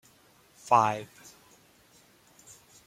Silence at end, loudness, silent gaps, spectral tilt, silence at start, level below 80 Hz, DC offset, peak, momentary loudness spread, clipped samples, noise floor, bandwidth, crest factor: 1.8 s; -26 LUFS; none; -4.5 dB/octave; 0.65 s; -74 dBFS; under 0.1%; -8 dBFS; 28 LU; under 0.1%; -61 dBFS; 16.5 kHz; 24 dB